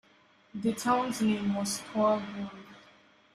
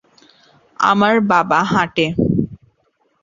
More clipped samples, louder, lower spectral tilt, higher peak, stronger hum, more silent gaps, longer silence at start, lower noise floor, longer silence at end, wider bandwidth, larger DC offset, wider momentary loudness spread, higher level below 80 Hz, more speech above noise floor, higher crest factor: neither; second, -30 LUFS vs -16 LUFS; second, -4.5 dB/octave vs -6 dB/octave; second, -16 dBFS vs -2 dBFS; neither; neither; second, 0.55 s vs 0.8 s; about the same, -63 dBFS vs -63 dBFS; about the same, 0.55 s vs 0.65 s; first, 15 kHz vs 7.4 kHz; neither; first, 14 LU vs 6 LU; second, -68 dBFS vs -44 dBFS; second, 33 dB vs 48 dB; about the same, 16 dB vs 16 dB